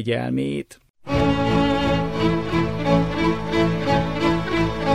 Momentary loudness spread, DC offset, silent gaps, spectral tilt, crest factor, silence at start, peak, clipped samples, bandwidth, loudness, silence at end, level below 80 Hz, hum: 6 LU; 1%; 0.90-0.94 s; -7 dB/octave; 14 dB; 0 s; -6 dBFS; under 0.1%; 11.5 kHz; -21 LUFS; 0 s; -36 dBFS; none